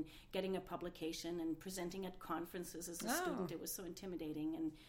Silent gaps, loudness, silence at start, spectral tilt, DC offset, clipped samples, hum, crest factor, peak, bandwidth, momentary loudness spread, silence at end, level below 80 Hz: none; -45 LUFS; 0 s; -4 dB/octave; under 0.1%; under 0.1%; none; 18 dB; -28 dBFS; 16.5 kHz; 7 LU; 0 s; -66 dBFS